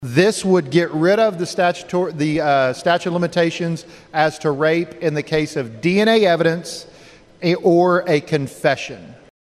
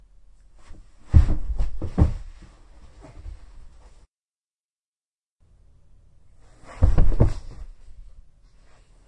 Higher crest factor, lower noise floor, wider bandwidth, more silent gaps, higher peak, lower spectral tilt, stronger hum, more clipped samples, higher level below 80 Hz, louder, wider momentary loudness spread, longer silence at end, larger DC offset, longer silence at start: about the same, 18 dB vs 22 dB; second, -45 dBFS vs under -90 dBFS; first, 13.5 kHz vs 8 kHz; second, none vs 4.08-4.12 s, 4.18-4.38 s, 4.47-4.51 s, 4.59-4.93 s, 5.07-5.39 s; about the same, 0 dBFS vs -2 dBFS; second, -5.5 dB/octave vs -9 dB/octave; neither; neither; second, -56 dBFS vs -28 dBFS; first, -18 LUFS vs -24 LUFS; second, 10 LU vs 27 LU; second, 0.3 s vs 1.05 s; neither; second, 0 s vs 0.7 s